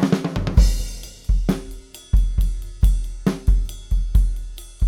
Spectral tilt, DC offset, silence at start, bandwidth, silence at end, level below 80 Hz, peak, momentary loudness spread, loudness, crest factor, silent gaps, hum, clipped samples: -6.5 dB/octave; under 0.1%; 0 s; 13.5 kHz; 0 s; -20 dBFS; -2 dBFS; 13 LU; -23 LUFS; 16 dB; none; none; under 0.1%